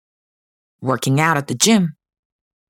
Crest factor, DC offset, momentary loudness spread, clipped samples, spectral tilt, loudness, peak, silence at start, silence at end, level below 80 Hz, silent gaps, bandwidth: 20 dB; under 0.1%; 10 LU; under 0.1%; -4 dB/octave; -17 LUFS; 0 dBFS; 0.8 s; 0.8 s; -60 dBFS; none; 18 kHz